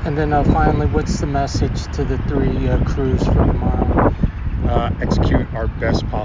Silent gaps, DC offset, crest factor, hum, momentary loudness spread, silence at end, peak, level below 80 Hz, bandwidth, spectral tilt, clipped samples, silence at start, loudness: none; under 0.1%; 16 dB; none; 6 LU; 0 s; -2 dBFS; -22 dBFS; 7.6 kHz; -7.5 dB/octave; under 0.1%; 0 s; -18 LUFS